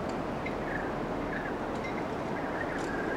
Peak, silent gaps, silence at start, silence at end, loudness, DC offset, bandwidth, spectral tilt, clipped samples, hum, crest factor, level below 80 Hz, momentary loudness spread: -20 dBFS; none; 0 s; 0 s; -34 LUFS; under 0.1%; 16.5 kHz; -6 dB/octave; under 0.1%; none; 14 dB; -50 dBFS; 1 LU